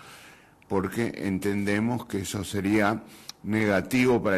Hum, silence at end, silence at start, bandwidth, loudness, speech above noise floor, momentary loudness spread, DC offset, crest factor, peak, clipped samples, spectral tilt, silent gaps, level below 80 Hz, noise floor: none; 0 s; 0 s; 13.5 kHz; -27 LUFS; 27 dB; 9 LU; under 0.1%; 18 dB; -10 dBFS; under 0.1%; -5.5 dB/octave; none; -56 dBFS; -52 dBFS